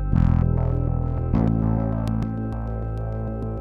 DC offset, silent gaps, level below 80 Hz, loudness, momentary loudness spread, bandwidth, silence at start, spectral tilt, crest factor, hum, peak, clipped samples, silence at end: under 0.1%; none; -28 dBFS; -24 LUFS; 9 LU; 5.2 kHz; 0 s; -10.5 dB/octave; 16 dB; none; -6 dBFS; under 0.1%; 0 s